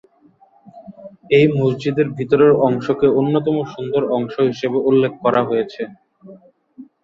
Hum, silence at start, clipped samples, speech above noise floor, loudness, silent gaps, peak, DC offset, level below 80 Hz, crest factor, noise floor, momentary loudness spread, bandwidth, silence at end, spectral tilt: none; 0.65 s; under 0.1%; 37 dB; -17 LUFS; none; -2 dBFS; under 0.1%; -58 dBFS; 16 dB; -53 dBFS; 8 LU; 7.2 kHz; 0.2 s; -8 dB/octave